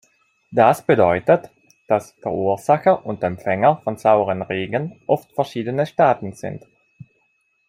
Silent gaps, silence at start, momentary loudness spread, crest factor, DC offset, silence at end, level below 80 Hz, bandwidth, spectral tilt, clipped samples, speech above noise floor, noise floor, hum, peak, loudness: none; 0.5 s; 9 LU; 18 dB; under 0.1%; 1.1 s; -60 dBFS; 15.5 kHz; -7 dB/octave; under 0.1%; 47 dB; -66 dBFS; none; -2 dBFS; -19 LUFS